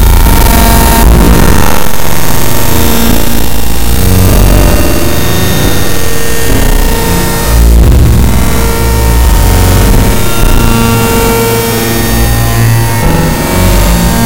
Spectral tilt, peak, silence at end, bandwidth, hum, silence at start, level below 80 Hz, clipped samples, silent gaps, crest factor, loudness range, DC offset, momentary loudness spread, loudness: -5 dB/octave; 0 dBFS; 0 s; over 20 kHz; none; 0 s; -10 dBFS; 9%; none; 6 dB; 2 LU; 20%; 5 LU; -8 LUFS